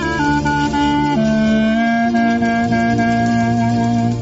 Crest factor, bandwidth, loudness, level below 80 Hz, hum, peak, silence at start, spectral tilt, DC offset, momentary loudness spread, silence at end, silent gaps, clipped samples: 12 dB; 8 kHz; -15 LUFS; -36 dBFS; none; -4 dBFS; 0 s; -5.5 dB/octave; under 0.1%; 2 LU; 0 s; none; under 0.1%